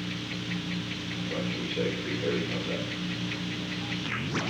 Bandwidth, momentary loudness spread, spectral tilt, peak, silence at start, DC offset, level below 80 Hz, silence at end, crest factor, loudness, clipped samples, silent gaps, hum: 11.5 kHz; 3 LU; -5 dB/octave; -16 dBFS; 0 s; under 0.1%; -58 dBFS; 0 s; 16 dB; -31 LUFS; under 0.1%; none; 60 Hz at -40 dBFS